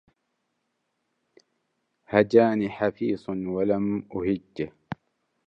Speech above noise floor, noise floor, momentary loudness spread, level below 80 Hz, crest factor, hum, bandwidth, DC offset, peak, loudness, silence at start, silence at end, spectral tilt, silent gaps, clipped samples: 53 dB; -77 dBFS; 15 LU; -60 dBFS; 22 dB; none; 7.4 kHz; under 0.1%; -4 dBFS; -25 LUFS; 2.1 s; 0.5 s; -8.5 dB/octave; none; under 0.1%